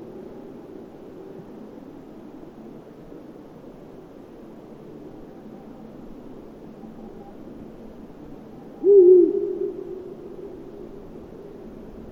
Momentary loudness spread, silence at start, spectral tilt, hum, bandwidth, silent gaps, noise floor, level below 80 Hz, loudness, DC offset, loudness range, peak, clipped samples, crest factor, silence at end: 22 LU; 0 s; -9.5 dB/octave; none; 3.5 kHz; none; -43 dBFS; -54 dBFS; -17 LUFS; under 0.1%; 22 LU; -4 dBFS; under 0.1%; 22 dB; 0 s